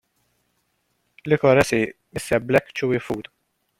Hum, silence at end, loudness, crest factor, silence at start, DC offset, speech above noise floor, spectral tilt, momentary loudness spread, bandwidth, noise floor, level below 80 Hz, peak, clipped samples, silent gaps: none; 0.6 s; -21 LUFS; 20 dB; 1.25 s; under 0.1%; 50 dB; -5.5 dB/octave; 14 LU; 16.5 kHz; -70 dBFS; -52 dBFS; -4 dBFS; under 0.1%; none